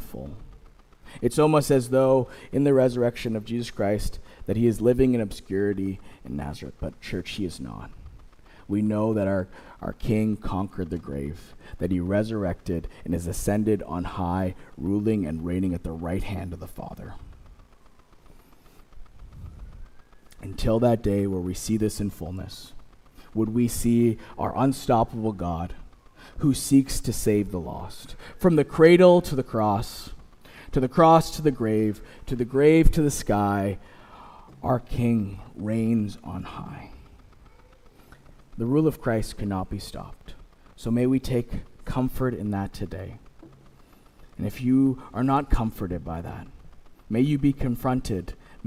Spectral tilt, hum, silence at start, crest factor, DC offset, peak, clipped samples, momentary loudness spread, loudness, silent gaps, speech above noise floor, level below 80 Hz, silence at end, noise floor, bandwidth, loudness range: -6.5 dB/octave; none; 0 s; 22 dB; under 0.1%; -4 dBFS; under 0.1%; 18 LU; -25 LUFS; none; 29 dB; -38 dBFS; 0.1 s; -53 dBFS; 16.5 kHz; 9 LU